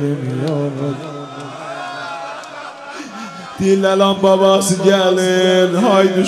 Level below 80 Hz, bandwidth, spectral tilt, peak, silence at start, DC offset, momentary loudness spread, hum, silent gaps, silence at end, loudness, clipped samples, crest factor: -56 dBFS; 15 kHz; -5 dB/octave; 0 dBFS; 0 s; under 0.1%; 17 LU; none; none; 0 s; -14 LUFS; under 0.1%; 16 dB